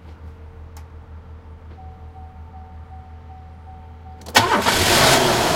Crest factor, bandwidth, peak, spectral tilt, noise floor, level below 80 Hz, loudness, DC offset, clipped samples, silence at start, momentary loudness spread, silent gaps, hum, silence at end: 22 dB; 16.5 kHz; 0 dBFS; -2.5 dB/octave; -39 dBFS; -42 dBFS; -15 LUFS; under 0.1%; under 0.1%; 0.05 s; 27 LU; none; none; 0 s